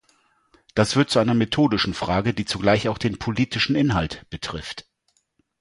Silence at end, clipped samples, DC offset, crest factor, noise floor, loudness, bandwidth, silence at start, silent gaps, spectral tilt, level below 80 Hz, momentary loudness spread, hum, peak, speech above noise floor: 0.8 s; under 0.1%; under 0.1%; 20 dB; -68 dBFS; -22 LUFS; 11.5 kHz; 0.75 s; none; -5.5 dB/octave; -44 dBFS; 12 LU; none; -4 dBFS; 47 dB